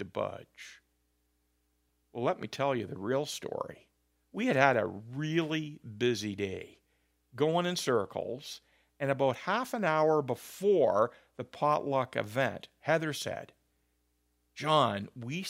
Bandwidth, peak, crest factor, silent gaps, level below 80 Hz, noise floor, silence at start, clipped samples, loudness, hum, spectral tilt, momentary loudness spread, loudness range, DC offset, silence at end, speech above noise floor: 16 kHz; -6 dBFS; 26 dB; none; -74 dBFS; -76 dBFS; 0 s; under 0.1%; -31 LUFS; 60 Hz at -60 dBFS; -5 dB/octave; 17 LU; 7 LU; under 0.1%; 0 s; 44 dB